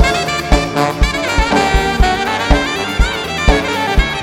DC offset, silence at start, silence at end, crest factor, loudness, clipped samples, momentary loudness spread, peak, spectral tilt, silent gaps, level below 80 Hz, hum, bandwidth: under 0.1%; 0 s; 0 s; 14 dB; -14 LUFS; under 0.1%; 3 LU; 0 dBFS; -4.5 dB/octave; none; -18 dBFS; none; 16 kHz